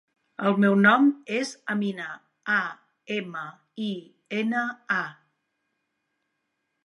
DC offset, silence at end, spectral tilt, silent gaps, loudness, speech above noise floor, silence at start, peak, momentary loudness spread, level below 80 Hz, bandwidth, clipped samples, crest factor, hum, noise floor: under 0.1%; 1.75 s; -6 dB/octave; none; -25 LUFS; 54 dB; 0.4 s; -6 dBFS; 19 LU; -80 dBFS; 11 kHz; under 0.1%; 22 dB; none; -78 dBFS